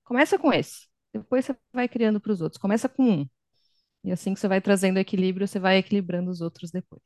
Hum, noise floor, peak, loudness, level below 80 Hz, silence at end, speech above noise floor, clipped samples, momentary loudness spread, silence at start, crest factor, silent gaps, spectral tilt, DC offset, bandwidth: none; -72 dBFS; -6 dBFS; -25 LUFS; -68 dBFS; 0.1 s; 47 dB; under 0.1%; 14 LU; 0.1 s; 18 dB; none; -6 dB/octave; under 0.1%; 12.5 kHz